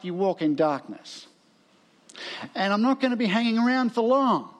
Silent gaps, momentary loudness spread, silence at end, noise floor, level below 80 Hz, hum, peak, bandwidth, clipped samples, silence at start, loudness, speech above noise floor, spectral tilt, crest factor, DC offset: none; 18 LU; 0.1 s; -61 dBFS; -84 dBFS; none; -10 dBFS; 10 kHz; under 0.1%; 0.05 s; -24 LUFS; 36 dB; -6 dB/octave; 16 dB; under 0.1%